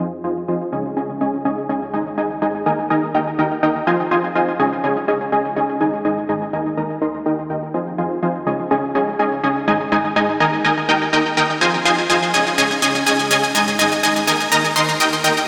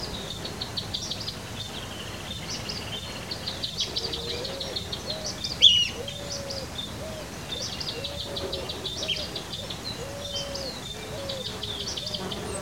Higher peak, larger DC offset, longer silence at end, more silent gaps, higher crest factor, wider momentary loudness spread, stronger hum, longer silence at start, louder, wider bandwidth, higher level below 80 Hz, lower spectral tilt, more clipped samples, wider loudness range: about the same, -2 dBFS vs -4 dBFS; second, under 0.1% vs 0.2%; about the same, 0 s vs 0 s; neither; second, 16 dB vs 28 dB; about the same, 7 LU vs 7 LU; neither; about the same, 0 s vs 0 s; first, -18 LUFS vs -28 LUFS; about the same, 16.5 kHz vs 16.5 kHz; second, -58 dBFS vs -48 dBFS; about the same, -3.5 dB/octave vs -2.5 dB/octave; neither; second, 5 LU vs 8 LU